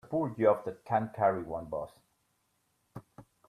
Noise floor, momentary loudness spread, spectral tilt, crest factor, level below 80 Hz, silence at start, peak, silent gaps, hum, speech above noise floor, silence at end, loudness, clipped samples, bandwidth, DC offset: -76 dBFS; 23 LU; -9 dB/octave; 22 dB; -66 dBFS; 0.05 s; -12 dBFS; none; none; 45 dB; 0.25 s; -31 LUFS; under 0.1%; 13 kHz; under 0.1%